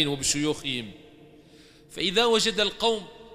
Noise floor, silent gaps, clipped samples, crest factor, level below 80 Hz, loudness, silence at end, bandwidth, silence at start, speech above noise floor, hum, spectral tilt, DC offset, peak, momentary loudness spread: -53 dBFS; none; under 0.1%; 20 dB; -54 dBFS; -25 LUFS; 0 s; 15.5 kHz; 0 s; 27 dB; none; -2.5 dB/octave; under 0.1%; -8 dBFS; 12 LU